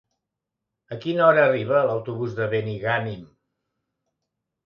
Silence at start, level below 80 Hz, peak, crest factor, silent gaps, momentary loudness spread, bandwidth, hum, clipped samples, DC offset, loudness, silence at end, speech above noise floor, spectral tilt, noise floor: 0.9 s; -64 dBFS; -4 dBFS; 20 dB; none; 16 LU; 6.6 kHz; none; under 0.1%; under 0.1%; -22 LUFS; 1.4 s; 62 dB; -8 dB/octave; -84 dBFS